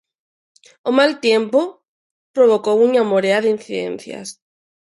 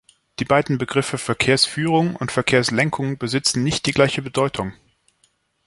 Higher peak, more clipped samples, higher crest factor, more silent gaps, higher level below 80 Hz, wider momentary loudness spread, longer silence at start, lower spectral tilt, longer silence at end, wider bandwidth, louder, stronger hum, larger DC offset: about the same, -2 dBFS vs -2 dBFS; neither; about the same, 16 dB vs 20 dB; first, 1.88-2.34 s vs none; second, -70 dBFS vs -50 dBFS; first, 14 LU vs 7 LU; first, 0.85 s vs 0.4 s; about the same, -4.5 dB/octave vs -4.5 dB/octave; second, 0.55 s vs 0.95 s; about the same, 11.5 kHz vs 11.5 kHz; first, -17 LUFS vs -20 LUFS; neither; neither